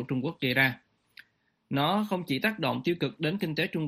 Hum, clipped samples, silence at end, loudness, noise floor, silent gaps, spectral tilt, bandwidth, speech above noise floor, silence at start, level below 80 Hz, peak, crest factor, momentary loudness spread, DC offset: none; under 0.1%; 0 s; -28 LUFS; -59 dBFS; none; -6.5 dB/octave; 15.5 kHz; 30 dB; 0 s; -68 dBFS; -10 dBFS; 20 dB; 6 LU; under 0.1%